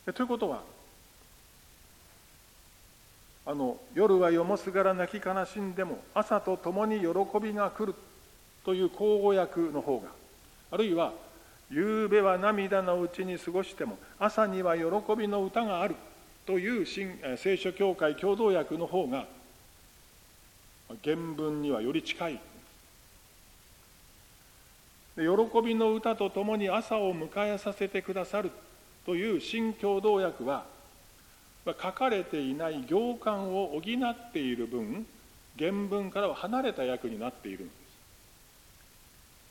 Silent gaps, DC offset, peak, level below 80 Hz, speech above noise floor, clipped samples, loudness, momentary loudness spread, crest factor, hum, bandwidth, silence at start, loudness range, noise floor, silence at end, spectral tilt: none; under 0.1%; -12 dBFS; -64 dBFS; 28 dB; under 0.1%; -31 LUFS; 12 LU; 20 dB; none; 17 kHz; 0.05 s; 6 LU; -58 dBFS; 1.8 s; -6 dB/octave